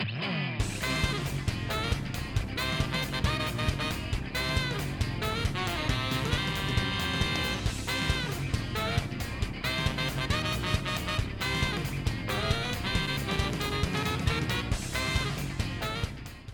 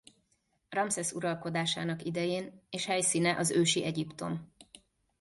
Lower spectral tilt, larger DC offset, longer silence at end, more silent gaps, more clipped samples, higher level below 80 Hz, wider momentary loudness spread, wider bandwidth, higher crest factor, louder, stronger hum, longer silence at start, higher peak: about the same, -4.5 dB/octave vs -3.5 dB/octave; neither; second, 0 s vs 0.55 s; neither; neither; first, -38 dBFS vs -70 dBFS; second, 4 LU vs 10 LU; first, 19.5 kHz vs 12 kHz; about the same, 18 dB vs 18 dB; about the same, -30 LUFS vs -32 LUFS; neither; second, 0 s vs 0.7 s; first, -12 dBFS vs -16 dBFS